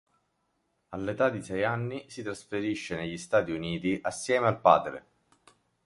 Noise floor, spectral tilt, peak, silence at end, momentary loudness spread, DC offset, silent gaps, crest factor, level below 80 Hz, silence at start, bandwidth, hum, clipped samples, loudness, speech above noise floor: -76 dBFS; -5.5 dB/octave; -6 dBFS; 0.85 s; 15 LU; under 0.1%; none; 24 dB; -60 dBFS; 0.9 s; 11.5 kHz; none; under 0.1%; -29 LUFS; 47 dB